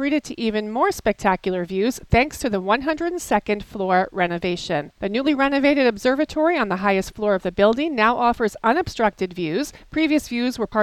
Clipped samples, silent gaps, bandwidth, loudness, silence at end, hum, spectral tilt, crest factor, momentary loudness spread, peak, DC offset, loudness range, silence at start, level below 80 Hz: under 0.1%; none; 14.5 kHz; -21 LUFS; 0 s; none; -5 dB/octave; 18 dB; 7 LU; -4 dBFS; under 0.1%; 2 LU; 0 s; -42 dBFS